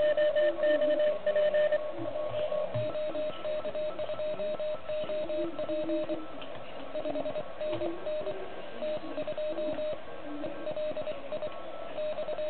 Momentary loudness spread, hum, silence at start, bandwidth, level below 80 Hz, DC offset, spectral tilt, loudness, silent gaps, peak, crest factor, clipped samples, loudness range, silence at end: 13 LU; none; 0 s; 4.5 kHz; -64 dBFS; 1%; -9 dB/octave; -33 LUFS; none; -16 dBFS; 14 dB; under 0.1%; 6 LU; 0 s